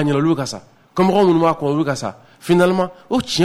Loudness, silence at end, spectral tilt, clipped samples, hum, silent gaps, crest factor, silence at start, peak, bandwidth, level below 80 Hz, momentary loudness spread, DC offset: -17 LUFS; 0 s; -6 dB/octave; under 0.1%; none; none; 14 dB; 0 s; -4 dBFS; 15 kHz; -52 dBFS; 14 LU; under 0.1%